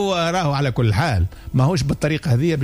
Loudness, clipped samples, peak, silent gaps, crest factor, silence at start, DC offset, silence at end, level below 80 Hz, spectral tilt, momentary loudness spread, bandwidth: -20 LUFS; under 0.1%; -8 dBFS; none; 12 dB; 0 s; under 0.1%; 0 s; -38 dBFS; -6.5 dB/octave; 3 LU; 16 kHz